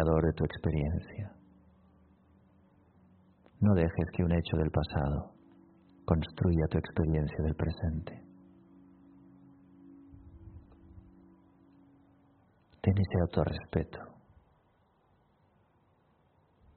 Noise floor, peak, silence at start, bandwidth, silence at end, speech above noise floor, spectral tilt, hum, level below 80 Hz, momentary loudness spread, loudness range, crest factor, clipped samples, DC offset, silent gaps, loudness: -69 dBFS; -10 dBFS; 0 s; 4.5 kHz; 2.65 s; 39 dB; -8 dB/octave; none; -46 dBFS; 23 LU; 8 LU; 24 dB; under 0.1%; under 0.1%; none; -32 LUFS